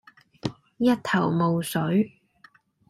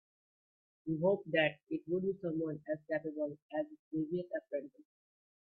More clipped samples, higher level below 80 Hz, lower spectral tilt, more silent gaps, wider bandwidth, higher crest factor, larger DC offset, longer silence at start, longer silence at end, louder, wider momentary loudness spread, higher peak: neither; first, -62 dBFS vs -78 dBFS; second, -6.5 dB/octave vs -9.5 dB/octave; second, none vs 3.42-3.49 s, 3.79-3.91 s; first, 14 kHz vs 4.5 kHz; second, 16 dB vs 22 dB; neither; second, 0.45 s vs 0.85 s; about the same, 0.8 s vs 0.7 s; first, -25 LUFS vs -37 LUFS; first, 13 LU vs 10 LU; first, -10 dBFS vs -18 dBFS